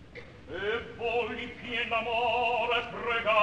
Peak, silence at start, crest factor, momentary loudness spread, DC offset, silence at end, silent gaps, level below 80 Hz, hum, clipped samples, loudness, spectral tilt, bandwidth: -12 dBFS; 0 s; 18 dB; 11 LU; 0.1%; 0 s; none; -56 dBFS; none; under 0.1%; -30 LUFS; -4.5 dB/octave; 9.4 kHz